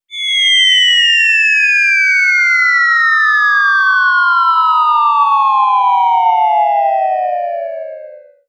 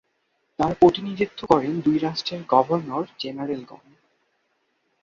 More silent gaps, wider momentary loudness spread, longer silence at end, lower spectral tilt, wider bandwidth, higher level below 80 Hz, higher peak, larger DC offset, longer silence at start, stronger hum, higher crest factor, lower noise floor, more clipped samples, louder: neither; second, 8 LU vs 13 LU; second, 0.3 s vs 1.3 s; second, 9 dB/octave vs -7 dB/octave; first, 11.5 kHz vs 7.4 kHz; second, under -90 dBFS vs -56 dBFS; about the same, 0 dBFS vs -2 dBFS; neither; second, 0.1 s vs 0.6 s; neither; second, 10 dB vs 22 dB; second, -34 dBFS vs -71 dBFS; neither; first, -9 LUFS vs -23 LUFS